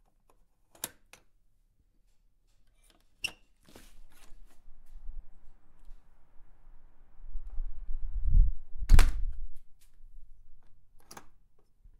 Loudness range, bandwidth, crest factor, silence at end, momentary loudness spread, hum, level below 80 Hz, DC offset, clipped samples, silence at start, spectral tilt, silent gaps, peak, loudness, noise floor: 22 LU; 14 kHz; 24 dB; 0.7 s; 29 LU; none; -32 dBFS; under 0.1%; under 0.1%; 0.85 s; -4 dB/octave; none; -6 dBFS; -34 LUFS; -67 dBFS